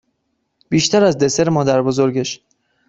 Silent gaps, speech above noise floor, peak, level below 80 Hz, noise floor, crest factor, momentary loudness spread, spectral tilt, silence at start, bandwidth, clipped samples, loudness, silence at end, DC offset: none; 55 dB; -2 dBFS; -54 dBFS; -70 dBFS; 16 dB; 9 LU; -5 dB/octave; 0.7 s; 8 kHz; under 0.1%; -16 LUFS; 0.55 s; under 0.1%